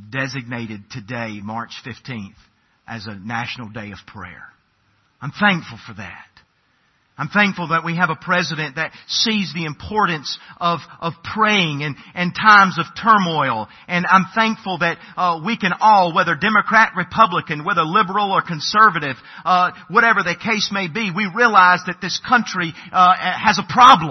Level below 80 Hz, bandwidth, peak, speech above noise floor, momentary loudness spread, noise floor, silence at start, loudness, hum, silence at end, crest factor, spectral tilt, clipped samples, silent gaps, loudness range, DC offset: -58 dBFS; 6.4 kHz; 0 dBFS; 44 dB; 18 LU; -62 dBFS; 0 s; -17 LUFS; none; 0 s; 18 dB; -4.5 dB/octave; under 0.1%; none; 14 LU; under 0.1%